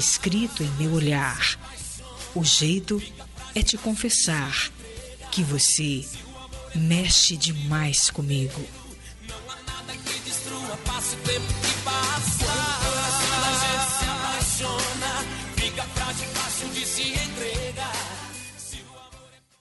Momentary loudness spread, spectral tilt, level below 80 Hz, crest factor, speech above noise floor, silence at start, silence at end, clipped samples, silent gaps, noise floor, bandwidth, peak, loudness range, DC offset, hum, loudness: 17 LU; -2.5 dB/octave; -40 dBFS; 18 dB; 26 dB; 0 s; 0.35 s; under 0.1%; none; -50 dBFS; 11.5 kHz; -8 dBFS; 6 LU; under 0.1%; none; -24 LUFS